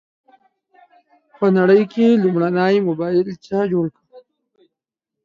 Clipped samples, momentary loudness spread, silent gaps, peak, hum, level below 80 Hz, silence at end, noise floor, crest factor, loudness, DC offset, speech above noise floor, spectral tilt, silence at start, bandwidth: under 0.1%; 8 LU; none; -2 dBFS; none; -64 dBFS; 1.05 s; -83 dBFS; 16 dB; -17 LUFS; under 0.1%; 67 dB; -8.5 dB/octave; 1.4 s; 7.2 kHz